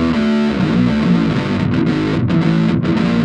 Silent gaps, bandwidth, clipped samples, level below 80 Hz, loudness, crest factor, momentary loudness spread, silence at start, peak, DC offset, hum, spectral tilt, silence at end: none; 8.8 kHz; under 0.1%; -36 dBFS; -15 LUFS; 12 dB; 2 LU; 0 s; -2 dBFS; under 0.1%; none; -8 dB/octave; 0 s